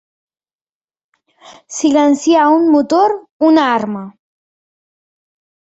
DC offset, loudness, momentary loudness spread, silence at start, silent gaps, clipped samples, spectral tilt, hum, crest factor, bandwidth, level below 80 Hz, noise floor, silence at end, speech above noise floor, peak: under 0.1%; -12 LUFS; 10 LU; 1.5 s; 3.31-3.40 s; under 0.1%; -4 dB/octave; none; 14 dB; 8 kHz; -62 dBFS; under -90 dBFS; 1.5 s; over 78 dB; -2 dBFS